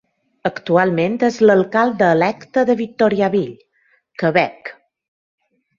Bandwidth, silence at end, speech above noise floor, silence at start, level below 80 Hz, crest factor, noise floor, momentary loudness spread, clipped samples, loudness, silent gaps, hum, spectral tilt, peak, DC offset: 7.4 kHz; 1.05 s; 45 dB; 0.45 s; -60 dBFS; 16 dB; -61 dBFS; 11 LU; under 0.1%; -17 LUFS; none; none; -7 dB/octave; -2 dBFS; under 0.1%